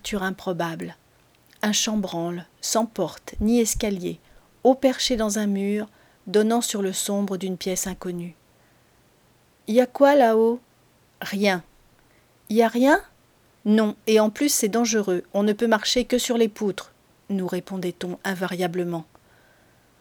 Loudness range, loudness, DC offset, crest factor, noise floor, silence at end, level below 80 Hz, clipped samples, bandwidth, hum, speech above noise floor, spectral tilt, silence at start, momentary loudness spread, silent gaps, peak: 5 LU; -23 LUFS; under 0.1%; 20 dB; -59 dBFS; 1 s; -50 dBFS; under 0.1%; over 20 kHz; none; 37 dB; -4 dB/octave; 0.05 s; 12 LU; none; -4 dBFS